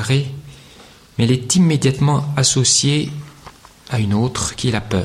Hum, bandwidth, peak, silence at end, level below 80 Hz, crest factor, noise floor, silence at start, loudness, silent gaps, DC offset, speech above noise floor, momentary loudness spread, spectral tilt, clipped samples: none; 13.5 kHz; -2 dBFS; 0 s; -44 dBFS; 16 dB; -44 dBFS; 0 s; -17 LUFS; none; under 0.1%; 28 dB; 15 LU; -4.5 dB/octave; under 0.1%